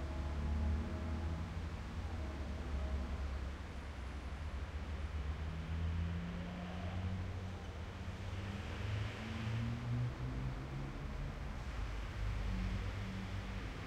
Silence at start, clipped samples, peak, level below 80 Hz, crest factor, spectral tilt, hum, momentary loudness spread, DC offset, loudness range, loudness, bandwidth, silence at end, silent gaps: 0 s; under 0.1%; -30 dBFS; -46 dBFS; 12 dB; -6.5 dB/octave; none; 6 LU; under 0.1%; 2 LU; -43 LUFS; 10.5 kHz; 0 s; none